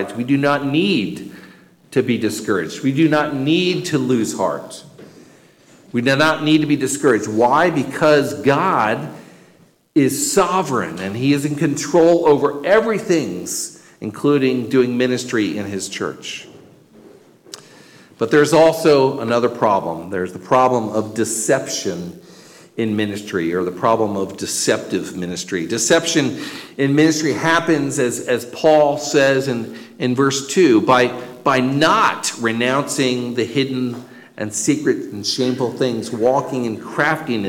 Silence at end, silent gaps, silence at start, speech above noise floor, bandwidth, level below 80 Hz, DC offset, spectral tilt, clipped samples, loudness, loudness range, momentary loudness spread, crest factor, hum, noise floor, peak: 0 s; none; 0 s; 35 dB; 17 kHz; -58 dBFS; under 0.1%; -4.5 dB/octave; under 0.1%; -17 LUFS; 5 LU; 11 LU; 14 dB; none; -52 dBFS; -4 dBFS